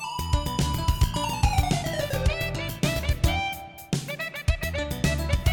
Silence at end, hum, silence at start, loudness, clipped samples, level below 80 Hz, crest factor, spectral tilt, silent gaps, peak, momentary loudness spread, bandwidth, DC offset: 0 s; none; 0 s; -27 LUFS; under 0.1%; -30 dBFS; 18 dB; -5 dB/octave; none; -8 dBFS; 6 LU; 19 kHz; under 0.1%